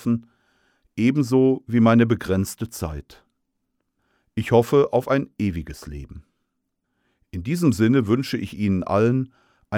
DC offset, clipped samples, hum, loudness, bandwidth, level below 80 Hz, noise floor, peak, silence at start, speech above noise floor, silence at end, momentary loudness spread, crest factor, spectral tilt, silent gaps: under 0.1%; under 0.1%; none; -21 LUFS; 16.5 kHz; -46 dBFS; -77 dBFS; -4 dBFS; 0 s; 56 dB; 0 s; 18 LU; 18 dB; -7 dB/octave; none